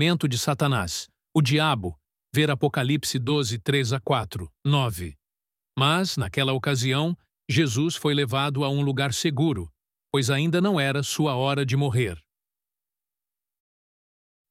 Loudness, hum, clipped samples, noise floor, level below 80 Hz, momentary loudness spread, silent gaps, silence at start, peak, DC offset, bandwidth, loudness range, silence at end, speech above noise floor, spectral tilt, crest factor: -24 LUFS; none; under 0.1%; under -90 dBFS; -54 dBFS; 8 LU; none; 0 s; -6 dBFS; under 0.1%; 16 kHz; 2 LU; 2.3 s; over 66 dB; -5 dB/octave; 18 dB